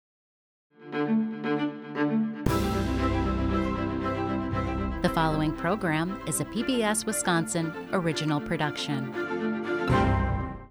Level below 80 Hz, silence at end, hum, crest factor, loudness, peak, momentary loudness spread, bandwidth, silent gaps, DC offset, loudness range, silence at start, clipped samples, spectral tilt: -40 dBFS; 0 s; none; 20 dB; -28 LUFS; -8 dBFS; 5 LU; over 20 kHz; none; under 0.1%; 1 LU; 0.8 s; under 0.1%; -5 dB/octave